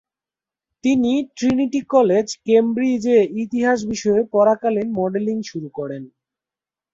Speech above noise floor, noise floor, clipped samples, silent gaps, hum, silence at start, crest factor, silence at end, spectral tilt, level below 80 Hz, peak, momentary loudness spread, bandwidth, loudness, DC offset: 72 dB; -90 dBFS; under 0.1%; none; none; 0.85 s; 16 dB; 0.85 s; -5.5 dB/octave; -58 dBFS; -2 dBFS; 12 LU; 7.8 kHz; -19 LUFS; under 0.1%